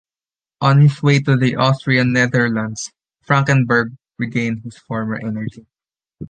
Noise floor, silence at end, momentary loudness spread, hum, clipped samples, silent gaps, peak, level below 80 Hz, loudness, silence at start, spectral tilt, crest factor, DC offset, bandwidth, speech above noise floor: under -90 dBFS; 0.05 s; 14 LU; none; under 0.1%; none; -2 dBFS; -54 dBFS; -17 LUFS; 0.6 s; -6.5 dB/octave; 16 dB; under 0.1%; 9.2 kHz; over 74 dB